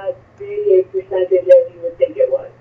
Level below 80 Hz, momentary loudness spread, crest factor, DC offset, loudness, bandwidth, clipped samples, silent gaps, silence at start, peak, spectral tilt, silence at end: -58 dBFS; 16 LU; 16 dB; under 0.1%; -15 LUFS; 4 kHz; under 0.1%; none; 0 s; 0 dBFS; -8 dB/octave; 0.1 s